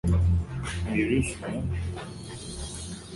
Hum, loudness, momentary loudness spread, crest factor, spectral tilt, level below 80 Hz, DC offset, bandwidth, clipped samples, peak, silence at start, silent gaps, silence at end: none; -30 LUFS; 13 LU; 14 dB; -6 dB/octave; -34 dBFS; under 0.1%; 11.5 kHz; under 0.1%; -14 dBFS; 0.05 s; none; 0 s